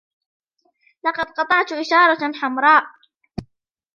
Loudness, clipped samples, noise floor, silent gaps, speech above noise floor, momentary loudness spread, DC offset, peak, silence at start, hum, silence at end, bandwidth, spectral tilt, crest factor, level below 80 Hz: -17 LUFS; under 0.1%; -62 dBFS; none; 45 dB; 21 LU; under 0.1%; -2 dBFS; 1.05 s; none; 0.55 s; 7.4 kHz; -4.5 dB/octave; 20 dB; -54 dBFS